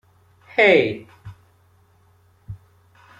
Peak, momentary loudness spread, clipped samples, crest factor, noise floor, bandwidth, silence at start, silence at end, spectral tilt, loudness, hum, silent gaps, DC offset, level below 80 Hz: -2 dBFS; 27 LU; under 0.1%; 22 dB; -57 dBFS; 9.6 kHz; 0.55 s; 0.65 s; -6 dB/octave; -17 LUFS; none; none; under 0.1%; -58 dBFS